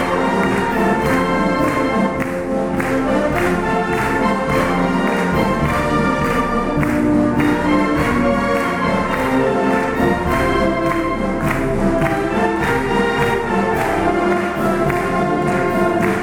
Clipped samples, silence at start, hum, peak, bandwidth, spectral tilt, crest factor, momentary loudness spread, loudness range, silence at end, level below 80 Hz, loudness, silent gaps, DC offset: under 0.1%; 0 s; none; -4 dBFS; 18 kHz; -6.5 dB/octave; 12 dB; 2 LU; 1 LU; 0 s; -32 dBFS; -17 LUFS; none; under 0.1%